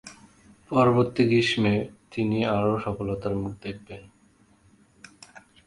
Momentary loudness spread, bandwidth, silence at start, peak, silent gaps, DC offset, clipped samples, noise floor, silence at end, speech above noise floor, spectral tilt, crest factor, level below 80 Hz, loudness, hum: 21 LU; 11.5 kHz; 0.05 s; -6 dBFS; none; under 0.1%; under 0.1%; -60 dBFS; 1.65 s; 36 dB; -6.5 dB/octave; 20 dB; -52 dBFS; -24 LUFS; none